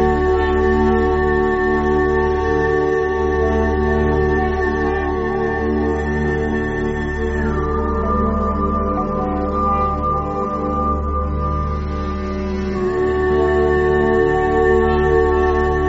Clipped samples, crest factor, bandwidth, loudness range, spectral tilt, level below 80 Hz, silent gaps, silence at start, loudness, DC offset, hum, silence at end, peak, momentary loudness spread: under 0.1%; 14 dB; 7.8 kHz; 4 LU; -6.5 dB/octave; -26 dBFS; none; 0 s; -18 LUFS; under 0.1%; none; 0 s; -4 dBFS; 6 LU